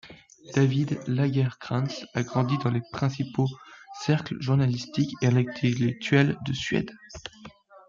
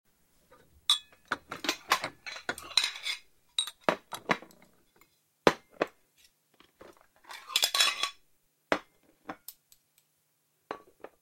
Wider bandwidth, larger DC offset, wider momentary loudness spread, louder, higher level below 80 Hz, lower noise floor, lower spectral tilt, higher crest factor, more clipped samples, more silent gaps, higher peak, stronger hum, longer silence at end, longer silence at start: second, 7.4 kHz vs 16.5 kHz; neither; second, 10 LU vs 19 LU; first, -26 LUFS vs -31 LUFS; first, -60 dBFS vs -68 dBFS; second, -49 dBFS vs -74 dBFS; first, -6.5 dB/octave vs -1 dB/octave; second, 18 dB vs 30 dB; neither; neither; second, -8 dBFS vs -4 dBFS; neither; about the same, 0.4 s vs 0.45 s; second, 0.05 s vs 0.9 s